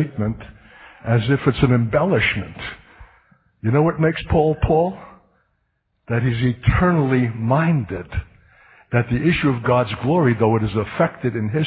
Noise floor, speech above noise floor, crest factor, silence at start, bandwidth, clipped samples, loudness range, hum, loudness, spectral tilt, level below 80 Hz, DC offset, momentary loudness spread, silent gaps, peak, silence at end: -70 dBFS; 51 dB; 18 dB; 0 s; 4.8 kHz; under 0.1%; 2 LU; none; -19 LUFS; -12.5 dB/octave; -36 dBFS; under 0.1%; 10 LU; none; -2 dBFS; 0 s